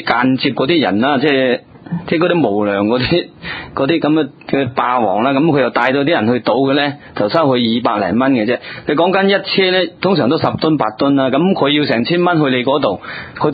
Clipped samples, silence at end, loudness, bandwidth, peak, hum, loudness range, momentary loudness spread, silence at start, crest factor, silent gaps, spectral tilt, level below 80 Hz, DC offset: under 0.1%; 0 s; -14 LUFS; 5 kHz; 0 dBFS; none; 2 LU; 6 LU; 0 s; 14 dB; none; -9 dB/octave; -48 dBFS; under 0.1%